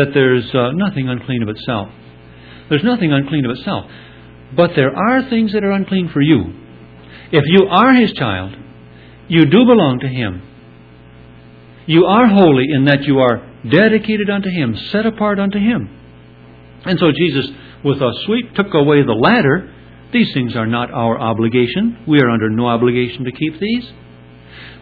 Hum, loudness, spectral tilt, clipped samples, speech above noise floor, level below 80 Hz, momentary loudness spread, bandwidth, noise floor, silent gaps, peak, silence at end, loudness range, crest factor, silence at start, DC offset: none; -14 LUFS; -9.5 dB/octave; under 0.1%; 27 dB; -46 dBFS; 12 LU; 4.9 kHz; -40 dBFS; none; 0 dBFS; 0.1 s; 5 LU; 14 dB; 0 s; under 0.1%